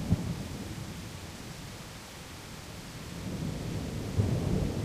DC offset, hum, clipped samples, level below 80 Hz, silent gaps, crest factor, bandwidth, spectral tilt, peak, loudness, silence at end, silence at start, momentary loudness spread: under 0.1%; none; under 0.1%; -46 dBFS; none; 22 dB; 15.5 kHz; -6 dB/octave; -14 dBFS; -36 LUFS; 0 s; 0 s; 13 LU